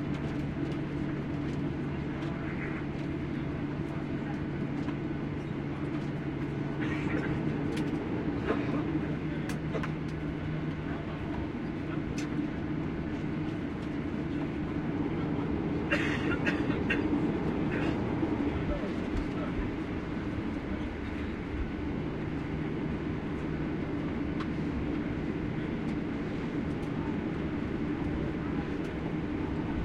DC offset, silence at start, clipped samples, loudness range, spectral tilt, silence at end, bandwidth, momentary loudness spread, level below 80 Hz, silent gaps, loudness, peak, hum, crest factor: under 0.1%; 0 s; under 0.1%; 4 LU; -8 dB/octave; 0 s; 11 kHz; 5 LU; -46 dBFS; none; -33 LUFS; -14 dBFS; none; 18 dB